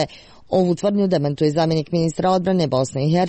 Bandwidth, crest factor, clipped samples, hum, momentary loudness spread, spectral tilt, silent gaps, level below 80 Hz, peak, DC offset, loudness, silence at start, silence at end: 8.8 kHz; 12 dB; under 0.1%; none; 3 LU; -7 dB/octave; none; -52 dBFS; -6 dBFS; under 0.1%; -20 LUFS; 0 s; 0 s